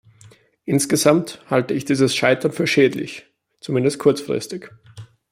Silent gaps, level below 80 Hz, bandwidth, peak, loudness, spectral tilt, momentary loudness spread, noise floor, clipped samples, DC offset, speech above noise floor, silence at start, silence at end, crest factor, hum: none; -62 dBFS; 16 kHz; -2 dBFS; -19 LUFS; -4.5 dB/octave; 16 LU; -50 dBFS; under 0.1%; under 0.1%; 31 dB; 0.65 s; 0.25 s; 18 dB; none